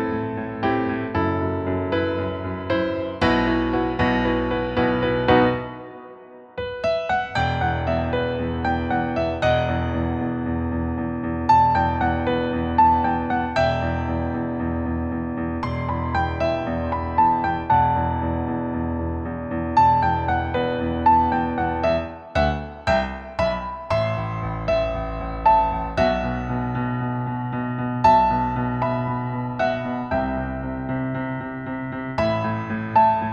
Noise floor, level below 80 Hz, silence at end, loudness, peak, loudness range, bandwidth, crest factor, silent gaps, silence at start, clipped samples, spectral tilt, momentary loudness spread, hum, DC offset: -43 dBFS; -36 dBFS; 0 s; -22 LUFS; -4 dBFS; 4 LU; 8 kHz; 18 dB; none; 0 s; under 0.1%; -8 dB/octave; 9 LU; none; under 0.1%